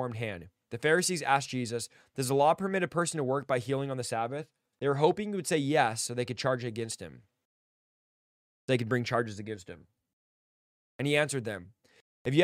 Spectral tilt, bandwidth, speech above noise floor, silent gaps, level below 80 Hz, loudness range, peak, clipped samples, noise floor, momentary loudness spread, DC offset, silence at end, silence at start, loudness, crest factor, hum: -4.5 dB/octave; 15.5 kHz; over 60 dB; 7.45-8.68 s, 10.13-10.99 s, 12.01-12.25 s; -70 dBFS; 6 LU; -10 dBFS; under 0.1%; under -90 dBFS; 15 LU; under 0.1%; 0 s; 0 s; -30 LUFS; 22 dB; none